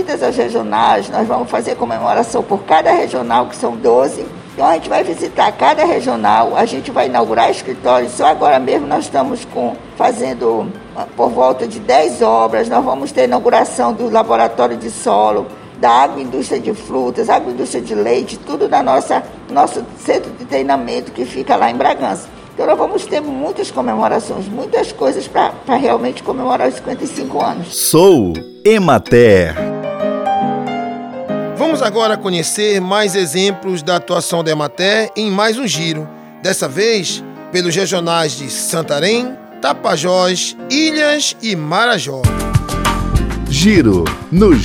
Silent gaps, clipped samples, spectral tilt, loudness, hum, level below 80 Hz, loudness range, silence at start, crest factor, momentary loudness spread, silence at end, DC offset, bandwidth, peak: none; under 0.1%; -4.5 dB/octave; -14 LUFS; none; -34 dBFS; 3 LU; 0 s; 14 dB; 9 LU; 0 s; under 0.1%; 16.5 kHz; 0 dBFS